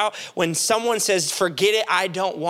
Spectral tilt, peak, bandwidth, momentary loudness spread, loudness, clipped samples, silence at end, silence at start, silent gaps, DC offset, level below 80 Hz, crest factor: -2 dB/octave; -4 dBFS; 17 kHz; 5 LU; -20 LUFS; under 0.1%; 0 s; 0 s; none; under 0.1%; -72 dBFS; 16 dB